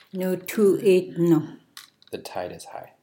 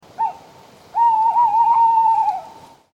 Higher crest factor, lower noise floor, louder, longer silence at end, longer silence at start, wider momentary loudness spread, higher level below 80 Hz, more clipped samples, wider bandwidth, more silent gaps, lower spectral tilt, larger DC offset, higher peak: first, 16 dB vs 10 dB; about the same, -49 dBFS vs -46 dBFS; second, -22 LUFS vs -16 LUFS; second, 0.2 s vs 0.45 s; about the same, 0.15 s vs 0.2 s; first, 19 LU vs 11 LU; second, -74 dBFS vs -68 dBFS; neither; first, 17 kHz vs 7.4 kHz; neither; first, -6.5 dB/octave vs -3.5 dB/octave; neither; about the same, -8 dBFS vs -8 dBFS